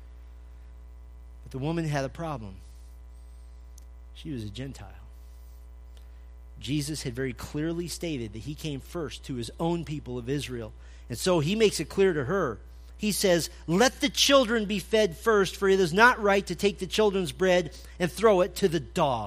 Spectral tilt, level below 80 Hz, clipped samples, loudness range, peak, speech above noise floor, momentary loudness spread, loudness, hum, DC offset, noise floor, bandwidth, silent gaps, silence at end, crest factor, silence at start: -4.5 dB/octave; -46 dBFS; under 0.1%; 17 LU; -4 dBFS; 19 dB; 16 LU; -26 LUFS; none; under 0.1%; -46 dBFS; 15.5 kHz; none; 0 s; 22 dB; 0 s